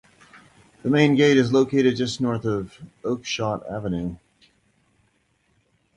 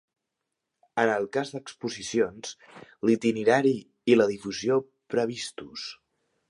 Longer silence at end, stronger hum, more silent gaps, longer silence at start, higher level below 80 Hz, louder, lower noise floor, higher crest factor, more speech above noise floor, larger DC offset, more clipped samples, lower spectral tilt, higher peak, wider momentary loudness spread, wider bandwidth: first, 1.8 s vs 0.55 s; neither; neither; about the same, 0.85 s vs 0.95 s; first, -54 dBFS vs -68 dBFS; first, -22 LUFS vs -27 LUFS; second, -66 dBFS vs -84 dBFS; about the same, 20 dB vs 20 dB; second, 45 dB vs 58 dB; neither; neither; about the same, -6 dB/octave vs -5 dB/octave; about the same, -4 dBFS vs -6 dBFS; about the same, 13 LU vs 15 LU; about the same, 11 kHz vs 11 kHz